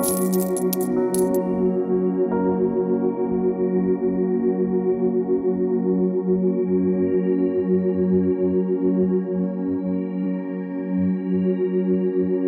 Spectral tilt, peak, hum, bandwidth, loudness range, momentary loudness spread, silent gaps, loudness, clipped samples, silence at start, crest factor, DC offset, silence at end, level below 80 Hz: -8 dB/octave; -8 dBFS; none; 16 kHz; 2 LU; 4 LU; none; -22 LUFS; under 0.1%; 0 s; 14 dB; under 0.1%; 0 s; -56 dBFS